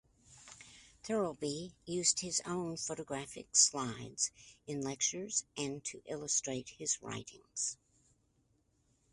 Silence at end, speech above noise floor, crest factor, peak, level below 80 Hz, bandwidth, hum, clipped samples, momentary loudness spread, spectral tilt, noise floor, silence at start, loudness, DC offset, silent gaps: 1.4 s; 37 dB; 26 dB; -12 dBFS; -72 dBFS; 11.5 kHz; none; under 0.1%; 18 LU; -2 dB/octave; -75 dBFS; 0.3 s; -35 LUFS; under 0.1%; none